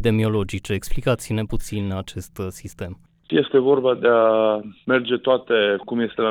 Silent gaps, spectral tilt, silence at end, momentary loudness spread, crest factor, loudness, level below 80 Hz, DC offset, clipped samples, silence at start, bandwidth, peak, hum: none; -6 dB/octave; 0 s; 15 LU; 14 dB; -21 LUFS; -38 dBFS; under 0.1%; under 0.1%; 0 s; 17 kHz; -6 dBFS; none